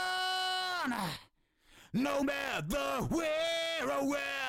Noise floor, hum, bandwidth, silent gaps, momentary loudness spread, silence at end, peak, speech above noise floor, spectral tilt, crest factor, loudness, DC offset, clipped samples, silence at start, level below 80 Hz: -67 dBFS; none; 16.5 kHz; none; 4 LU; 0 s; -20 dBFS; 33 dB; -3.5 dB/octave; 14 dB; -34 LUFS; under 0.1%; under 0.1%; 0 s; -56 dBFS